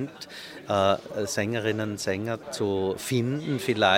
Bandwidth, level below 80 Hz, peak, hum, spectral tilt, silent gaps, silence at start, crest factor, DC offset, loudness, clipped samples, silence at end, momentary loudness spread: 18 kHz; -64 dBFS; -6 dBFS; none; -4.5 dB/octave; none; 0 s; 22 dB; under 0.1%; -27 LUFS; under 0.1%; 0 s; 10 LU